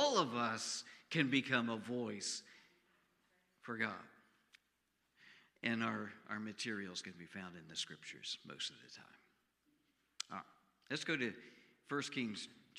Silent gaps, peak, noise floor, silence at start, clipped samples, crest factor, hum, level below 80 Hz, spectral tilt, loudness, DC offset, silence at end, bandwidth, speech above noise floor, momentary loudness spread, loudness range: none; -18 dBFS; -83 dBFS; 0 s; under 0.1%; 26 dB; none; -88 dBFS; -3.5 dB/octave; -41 LUFS; under 0.1%; 0 s; 13 kHz; 41 dB; 16 LU; 8 LU